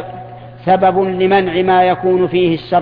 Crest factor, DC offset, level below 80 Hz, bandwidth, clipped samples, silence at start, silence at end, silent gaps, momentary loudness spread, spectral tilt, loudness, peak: 14 dB; under 0.1%; -46 dBFS; 5 kHz; under 0.1%; 0 s; 0 s; none; 15 LU; -9.5 dB/octave; -13 LUFS; 0 dBFS